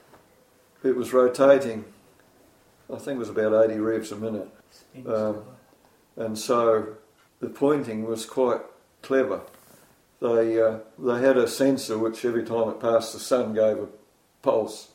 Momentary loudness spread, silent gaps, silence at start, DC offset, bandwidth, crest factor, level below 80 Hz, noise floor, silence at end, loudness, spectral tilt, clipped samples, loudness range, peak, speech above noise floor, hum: 13 LU; none; 0.85 s; under 0.1%; 16 kHz; 20 dB; -68 dBFS; -59 dBFS; 0.1 s; -24 LUFS; -5 dB/octave; under 0.1%; 4 LU; -6 dBFS; 35 dB; none